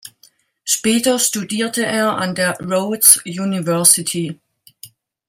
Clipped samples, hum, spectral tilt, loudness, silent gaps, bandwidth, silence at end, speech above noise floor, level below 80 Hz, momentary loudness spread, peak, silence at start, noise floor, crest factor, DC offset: under 0.1%; none; -2.5 dB/octave; -15 LUFS; none; 17 kHz; 0.4 s; 37 dB; -62 dBFS; 12 LU; 0 dBFS; 0.05 s; -54 dBFS; 18 dB; under 0.1%